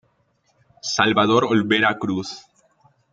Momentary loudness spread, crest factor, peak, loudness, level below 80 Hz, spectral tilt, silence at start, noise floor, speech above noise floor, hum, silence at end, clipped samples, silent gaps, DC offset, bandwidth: 15 LU; 20 dB; -2 dBFS; -19 LUFS; -62 dBFS; -4 dB/octave; 0.85 s; -65 dBFS; 46 dB; none; 0.75 s; under 0.1%; none; under 0.1%; 7.8 kHz